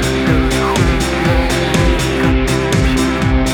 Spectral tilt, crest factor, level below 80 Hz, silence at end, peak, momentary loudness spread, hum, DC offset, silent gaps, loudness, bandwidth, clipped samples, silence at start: -5.5 dB/octave; 12 dB; -20 dBFS; 0 s; 0 dBFS; 1 LU; none; under 0.1%; none; -14 LUFS; 19.5 kHz; under 0.1%; 0 s